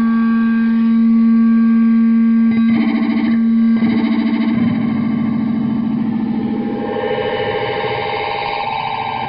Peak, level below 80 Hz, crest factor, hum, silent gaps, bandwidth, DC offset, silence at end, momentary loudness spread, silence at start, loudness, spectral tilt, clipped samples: -6 dBFS; -50 dBFS; 8 dB; none; none; 5.2 kHz; under 0.1%; 0 s; 7 LU; 0 s; -15 LUFS; -10.5 dB/octave; under 0.1%